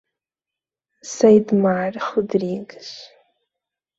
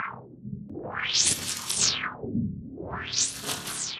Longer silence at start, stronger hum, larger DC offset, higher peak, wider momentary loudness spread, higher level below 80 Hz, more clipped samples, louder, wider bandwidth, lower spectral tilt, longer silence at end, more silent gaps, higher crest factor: first, 1.05 s vs 0 s; neither; neither; first, -2 dBFS vs -6 dBFS; first, 22 LU vs 17 LU; second, -64 dBFS vs -54 dBFS; neither; first, -18 LUFS vs -27 LUFS; second, 7.8 kHz vs 15.5 kHz; first, -6 dB/octave vs -1.5 dB/octave; first, 0.95 s vs 0 s; neither; about the same, 20 dB vs 24 dB